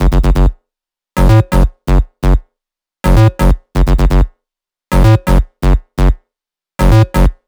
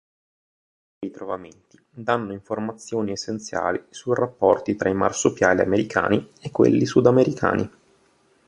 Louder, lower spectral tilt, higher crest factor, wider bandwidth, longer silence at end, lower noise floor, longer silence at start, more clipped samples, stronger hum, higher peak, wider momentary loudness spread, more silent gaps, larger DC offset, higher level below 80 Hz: first, -13 LUFS vs -22 LUFS; first, -7.5 dB/octave vs -5.5 dB/octave; second, 10 dB vs 20 dB; first, 15 kHz vs 11 kHz; second, 0.15 s vs 0.8 s; first, -86 dBFS vs -61 dBFS; second, 0 s vs 1 s; neither; neither; about the same, 0 dBFS vs -2 dBFS; second, 8 LU vs 14 LU; neither; neither; first, -12 dBFS vs -54 dBFS